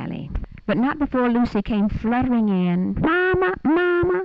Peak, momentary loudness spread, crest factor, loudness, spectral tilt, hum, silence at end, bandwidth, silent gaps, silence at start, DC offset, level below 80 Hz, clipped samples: -10 dBFS; 8 LU; 10 dB; -20 LUFS; -9 dB/octave; none; 0 s; 5.8 kHz; none; 0 s; under 0.1%; -36 dBFS; under 0.1%